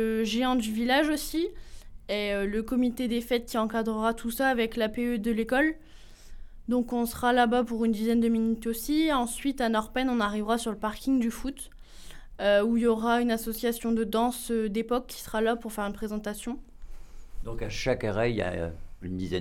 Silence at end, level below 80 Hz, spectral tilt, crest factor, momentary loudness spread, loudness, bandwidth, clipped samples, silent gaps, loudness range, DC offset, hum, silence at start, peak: 0 s; -44 dBFS; -4.5 dB/octave; 16 dB; 11 LU; -28 LUFS; 17 kHz; under 0.1%; none; 6 LU; under 0.1%; none; 0 s; -12 dBFS